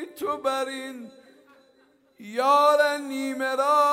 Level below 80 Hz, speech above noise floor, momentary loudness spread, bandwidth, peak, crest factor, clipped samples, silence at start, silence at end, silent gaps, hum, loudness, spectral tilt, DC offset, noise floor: -78 dBFS; 38 dB; 16 LU; 16 kHz; -8 dBFS; 18 dB; under 0.1%; 0 s; 0 s; none; none; -23 LUFS; -2 dB/octave; under 0.1%; -61 dBFS